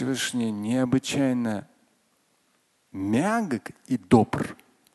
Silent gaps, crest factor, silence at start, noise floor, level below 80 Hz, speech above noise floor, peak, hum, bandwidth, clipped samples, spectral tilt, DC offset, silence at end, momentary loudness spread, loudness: none; 22 dB; 0 s; -68 dBFS; -56 dBFS; 43 dB; -4 dBFS; none; 12.5 kHz; under 0.1%; -5.5 dB/octave; under 0.1%; 0.4 s; 12 LU; -26 LUFS